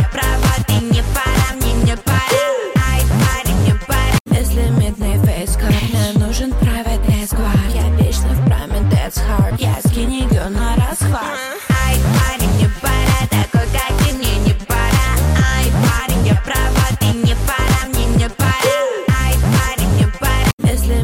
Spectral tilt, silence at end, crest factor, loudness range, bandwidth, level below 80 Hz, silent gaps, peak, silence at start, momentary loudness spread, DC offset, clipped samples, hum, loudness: -5 dB/octave; 0 s; 10 dB; 1 LU; 17 kHz; -18 dBFS; 4.20-4.25 s, 20.53-20.58 s; -4 dBFS; 0 s; 3 LU; under 0.1%; under 0.1%; none; -16 LUFS